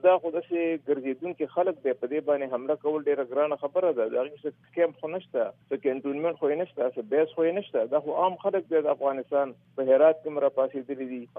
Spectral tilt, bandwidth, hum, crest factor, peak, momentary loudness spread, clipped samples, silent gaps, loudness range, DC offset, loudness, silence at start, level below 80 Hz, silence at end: -9.5 dB/octave; 3.7 kHz; none; 18 dB; -10 dBFS; 7 LU; under 0.1%; none; 3 LU; under 0.1%; -27 LUFS; 0.05 s; -86 dBFS; 0 s